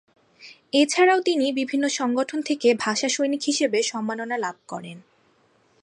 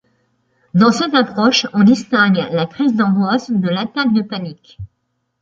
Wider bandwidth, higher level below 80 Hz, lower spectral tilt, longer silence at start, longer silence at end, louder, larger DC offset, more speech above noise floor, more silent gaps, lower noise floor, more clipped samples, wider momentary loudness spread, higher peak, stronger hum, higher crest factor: first, 11 kHz vs 7.6 kHz; second, -78 dBFS vs -52 dBFS; second, -2.5 dB/octave vs -5.5 dB/octave; second, 0.4 s vs 0.75 s; first, 0.8 s vs 0.55 s; second, -22 LUFS vs -15 LUFS; neither; second, 39 dB vs 55 dB; neither; second, -62 dBFS vs -70 dBFS; neither; first, 12 LU vs 8 LU; second, -6 dBFS vs 0 dBFS; neither; about the same, 16 dB vs 16 dB